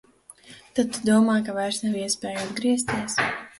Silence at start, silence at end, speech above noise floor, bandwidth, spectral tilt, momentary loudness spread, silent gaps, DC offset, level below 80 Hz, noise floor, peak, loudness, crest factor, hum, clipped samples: 0.45 s; 0.1 s; 26 dB; 11.5 kHz; -4 dB/octave; 7 LU; none; under 0.1%; -62 dBFS; -50 dBFS; -8 dBFS; -24 LUFS; 18 dB; none; under 0.1%